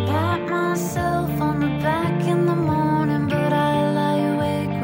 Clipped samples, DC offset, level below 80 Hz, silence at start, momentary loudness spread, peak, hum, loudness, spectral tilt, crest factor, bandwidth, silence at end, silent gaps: under 0.1%; under 0.1%; -46 dBFS; 0 s; 3 LU; -8 dBFS; none; -21 LUFS; -7 dB/octave; 12 dB; 16.5 kHz; 0 s; none